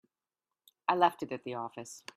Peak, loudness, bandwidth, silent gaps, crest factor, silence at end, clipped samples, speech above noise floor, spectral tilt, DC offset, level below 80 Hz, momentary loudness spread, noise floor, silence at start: -12 dBFS; -33 LUFS; 14.5 kHz; none; 24 dB; 0.15 s; under 0.1%; over 57 dB; -4.5 dB/octave; under 0.1%; -80 dBFS; 14 LU; under -90 dBFS; 0.9 s